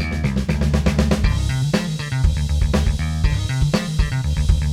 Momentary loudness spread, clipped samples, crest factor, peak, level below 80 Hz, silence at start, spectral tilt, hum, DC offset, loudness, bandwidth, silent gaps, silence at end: 3 LU; under 0.1%; 16 dB; -2 dBFS; -22 dBFS; 0 s; -6 dB/octave; none; under 0.1%; -20 LUFS; 14 kHz; none; 0 s